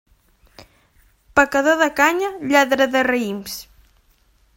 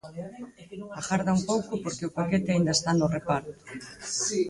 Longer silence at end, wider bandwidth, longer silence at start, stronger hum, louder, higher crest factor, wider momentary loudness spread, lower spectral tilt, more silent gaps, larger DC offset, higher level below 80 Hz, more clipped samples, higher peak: first, 0.95 s vs 0 s; first, 16.5 kHz vs 11.5 kHz; first, 0.6 s vs 0.05 s; neither; first, -17 LUFS vs -27 LUFS; about the same, 20 dB vs 18 dB; second, 12 LU vs 18 LU; second, -3 dB/octave vs -4.5 dB/octave; neither; neither; first, -52 dBFS vs -58 dBFS; neither; first, 0 dBFS vs -10 dBFS